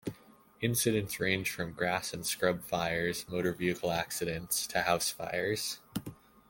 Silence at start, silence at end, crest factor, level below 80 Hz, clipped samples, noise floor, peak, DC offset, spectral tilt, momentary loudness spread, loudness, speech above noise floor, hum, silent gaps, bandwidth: 0.05 s; 0.35 s; 20 dB; -62 dBFS; under 0.1%; -59 dBFS; -12 dBFS; under 0.1%; -3.5 dB/octave; 6 LU; -32 LUFS; 26 dB; none; none; 17 kHz